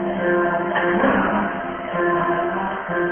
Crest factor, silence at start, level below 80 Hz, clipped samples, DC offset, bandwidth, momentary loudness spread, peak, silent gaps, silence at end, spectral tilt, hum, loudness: 16 dB; 0 s; -48 dBFS; under 0.1%; under 0.1%; 3.5 kHz; 7 LU; -6 dBFS; none; 0 s; -11 dB/octave; none; -20 LUFS